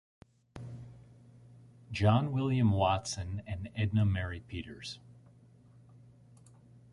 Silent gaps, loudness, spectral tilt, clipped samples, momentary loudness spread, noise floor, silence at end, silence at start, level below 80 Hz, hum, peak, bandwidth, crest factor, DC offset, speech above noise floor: none; -32 LUFS; -6.5 dB/octave; under 0.1%; 21 LU; -59 dBFS; 1.8 s; 0.55 s; -50 dBFS; none; -12 dBFS; 11.5 kHz; 22 dB; under 0.1%; 28 dB